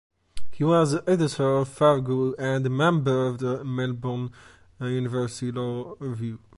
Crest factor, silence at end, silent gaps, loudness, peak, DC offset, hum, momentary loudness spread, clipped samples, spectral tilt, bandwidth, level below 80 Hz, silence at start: 18 dB; 0.2 s; none; -25 LUFS; -6 dBFS; under 0.1%; none; 11 LU; under 0.1%; -7 dB/octave; 11.5 kHz; -56 dBFS; 0.35 s